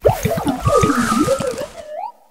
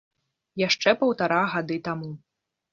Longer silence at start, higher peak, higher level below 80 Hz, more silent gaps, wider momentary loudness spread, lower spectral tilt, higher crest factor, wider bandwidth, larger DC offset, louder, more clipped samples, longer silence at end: second, 0 s vs 0.55 s; first, 0 dBFS vs -4 dBFS; first, -34 dBFS vs -68 dBFS; neither; second, 15 LU vs 18 LU; about the same, -5.5 dB/octave vs -4.5 dB/octave; about the same, 18 dB vs 22 dB; first, 16.5 kHz vs 7.4 kHz; neither; first, -17 LUFS vs -24 LUFS; neither; second, 0.2 s vs 0.55 s